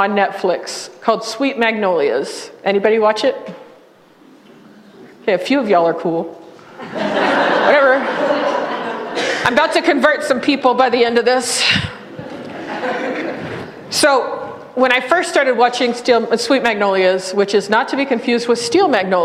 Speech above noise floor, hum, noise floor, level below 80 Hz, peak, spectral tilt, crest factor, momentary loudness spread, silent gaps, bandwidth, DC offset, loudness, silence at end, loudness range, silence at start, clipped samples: 31 dB; none; -47 dBFS; -56 dBFS; 0 dBFS; -3.5 dB/octave; 16 dB; 13 LU; none; 15 kHz; under 0.1%; -15 LUFS; 0 s; 5 LU; 0 s; under 0.1%